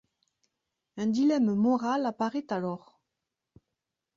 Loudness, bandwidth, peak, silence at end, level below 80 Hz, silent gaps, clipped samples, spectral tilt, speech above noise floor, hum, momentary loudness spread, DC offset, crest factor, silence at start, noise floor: -28 LUFS; 7.6 kHz; -16 dBFS; 1.4 s; -74 dBFS; none; under 0.1%; -7 dB/octave; 59 dB; none; 11 LU; under 0.1%; 14 dB; 0.95 s; -86 dBFS